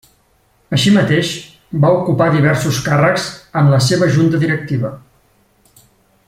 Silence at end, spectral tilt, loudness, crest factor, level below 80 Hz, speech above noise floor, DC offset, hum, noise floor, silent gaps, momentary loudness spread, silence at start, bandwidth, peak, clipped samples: 1.3 s; -6 dB/octave; -14 LUFS; 14 dB; -48 dBFS; 43 dB; under 0.1%; none; -56 dBFS; none; 9 LU; 0.7 s; 15.5 kHz; 0 dBFS; under 0.1%